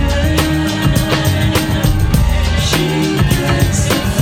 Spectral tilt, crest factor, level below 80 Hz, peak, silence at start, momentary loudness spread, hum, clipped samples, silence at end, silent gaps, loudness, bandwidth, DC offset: -5 dB/octave; 12 dB; -20 dBFS; 0 dBFS; 0 s; 1 LU; none; under 0.1%; 0 s; none; -14 LUFS; 17.5 kHz; under 0.1%